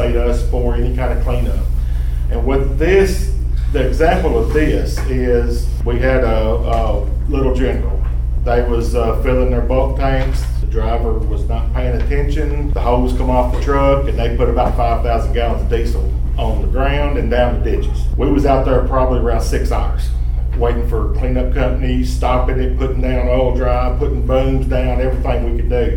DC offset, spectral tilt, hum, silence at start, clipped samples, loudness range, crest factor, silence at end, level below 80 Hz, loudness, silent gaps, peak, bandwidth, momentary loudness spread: under 0.1%; -7.5 dB/octave; none; 0 s; under 0.1%; 2 LU; 12 dB; 0 s; -16 dBFS; -17 LUFS; none; -2 dBFS; 12 kHz; 5 LU